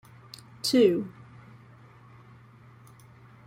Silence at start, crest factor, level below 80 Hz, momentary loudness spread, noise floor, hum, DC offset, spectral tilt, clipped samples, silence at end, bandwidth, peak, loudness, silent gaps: 0.65 s; 22 dB; -70 dBFS; 28 LU; -53 dBFS; none; under 0.1%; -5 dB/octave; under 0.1%; 2.35 s; 16 kHz; -10 dBFS; -24 LUFS; none